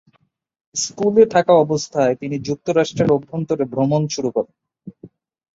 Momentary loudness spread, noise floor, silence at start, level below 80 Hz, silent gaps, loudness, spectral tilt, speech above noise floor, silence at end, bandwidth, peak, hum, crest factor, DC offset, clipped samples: 10 LU; -64 dBFS; 0.75 s; -58 dBFS; none; -18 LUFS; -5.5 dB/octave; 47 dB; 0.5 s; 8 kHz; -2 dBFS; none; 18 dB; under 0.1%; under 0.1%